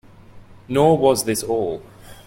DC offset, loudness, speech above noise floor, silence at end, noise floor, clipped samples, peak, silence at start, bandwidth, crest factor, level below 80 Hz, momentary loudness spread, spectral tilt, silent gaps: under 0.1%; -19 LUFS; 25 dB; 0.15 s; -43 dBFS; under 0.1%; -2 dBFS; 0.35 s; 16.5 kHz; 18 dB; -50 dBFS; 11 LU; -5 dB/octave; none